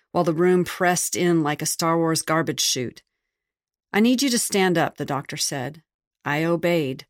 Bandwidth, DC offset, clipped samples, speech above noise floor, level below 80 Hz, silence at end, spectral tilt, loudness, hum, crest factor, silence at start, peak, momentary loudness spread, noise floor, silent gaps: 16.5 kHz; under 0.1%; under 0.1%; 65 dB; -64 dBFS; 0.05 s; -4 dB/octave; -22 LUFS; none; 16 dB; 0.15 s; -6 dBFS; 7 LU; -87 dBFS; 5.94-5.99 s, 6.07-6.11 s